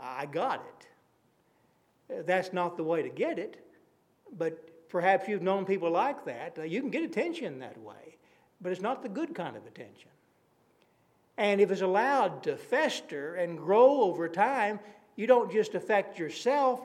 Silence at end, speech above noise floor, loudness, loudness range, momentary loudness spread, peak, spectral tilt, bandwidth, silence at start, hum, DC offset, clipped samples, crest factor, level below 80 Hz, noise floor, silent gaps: 0 s; 40 dB; -30 LUFS; 10 LU; 16 LU; -8 dBFS; -5.5 dB/octave; 12.5 kHz; 0 s; none; under 0.1%; under 0.1%; 22 dB; -88 dBFS; -69 dBFS; none